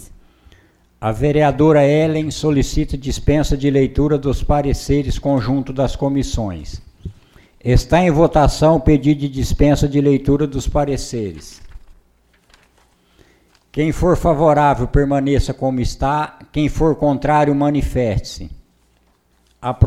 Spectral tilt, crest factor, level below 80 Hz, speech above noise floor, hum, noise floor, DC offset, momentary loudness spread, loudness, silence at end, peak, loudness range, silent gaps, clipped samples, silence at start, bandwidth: -7 dB/octave; 16 dB; -26 dBFS; 42 dB; none; -58 dBFS; under 0.1%; 13 LU; -17 LUFS; 0 s; 0 dBFS; 6 LU; none; under 0.1%; 0 s; 14 kHz